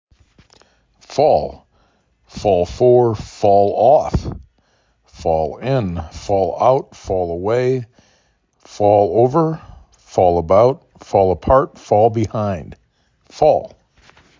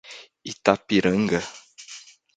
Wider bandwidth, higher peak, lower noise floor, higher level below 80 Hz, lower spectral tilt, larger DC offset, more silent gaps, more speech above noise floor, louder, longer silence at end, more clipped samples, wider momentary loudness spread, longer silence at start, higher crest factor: second, 7.6 kHz vs 9.2 kHz; about the same, 0 dBFS vs 0 dBFS; first, -60 dBFS vs -46 dBFS; first, -38 dBFS vs -56 dBFS; first, -7.5 dB/octave vs -5 dB/octave; neither; neither; first, 45 dB vs 23 dB; first, -16 LUFS vs -22 LUFS; first, 0.7 s vs 0.4 s; neither; second, 12 LU vs 21 LU; first, 1.1 s vs 0.1 s; second, 16 dB vs 24 dB